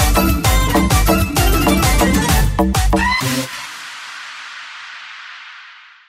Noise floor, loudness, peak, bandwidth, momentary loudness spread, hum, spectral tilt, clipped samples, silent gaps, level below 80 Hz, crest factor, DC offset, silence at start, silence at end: -41 dBFS; -15 LUFS; -2 dBFS; 16.5 kHz; 18 LU; none; -4.5 dB/octave; under 0.1%; none; -20 dBFS; 14 dB; under 0.1%; 0 s; 0.35 s